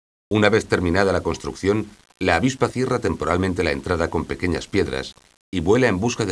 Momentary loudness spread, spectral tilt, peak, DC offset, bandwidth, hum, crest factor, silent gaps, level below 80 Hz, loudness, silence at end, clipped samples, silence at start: 8 LU; -5.5 dB/octave; 0 dBFS; under 0.1%; 11 kHz; none; 22 dB; 5.41-5.52 s; -42 dBFS; -21 LUFS; 0 s; under 0.1%; 0.3 s